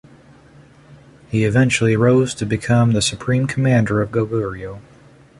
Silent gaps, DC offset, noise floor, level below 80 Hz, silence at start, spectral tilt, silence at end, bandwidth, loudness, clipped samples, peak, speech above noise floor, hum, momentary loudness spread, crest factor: none; under 0.1%; -46 dBFS; -46 dBFS; 0.9 s; -6 dB/octave; 0.6 s; 11.5 kHz; -17 LUFS; under 0.1%; -2 dBFS; 30 dB; none; 10 LU; 16 dB